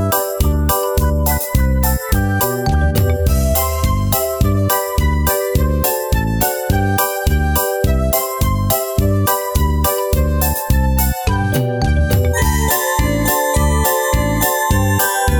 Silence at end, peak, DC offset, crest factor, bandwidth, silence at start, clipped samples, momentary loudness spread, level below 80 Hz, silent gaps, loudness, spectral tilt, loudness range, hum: 0 s; 0 dBFS; under 0.1%; 14 dB; over 20 kHz; 0 s; under 0.1%; 2 LU; -20 dBFS; none; -16 LUFS; -5 dB/octave; 1 LU; none